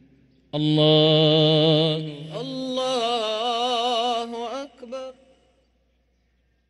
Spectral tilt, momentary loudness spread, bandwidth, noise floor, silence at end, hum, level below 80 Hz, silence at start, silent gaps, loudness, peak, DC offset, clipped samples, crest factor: -6 dB/octave; 18 LU; 11.5 kHz; -66 dBFS; 1.6 s; none; -66 dBFS; 0.55 s; none; -21 LUFS; -6 dBFS; under 0.1%; under 0.1%; 18 dB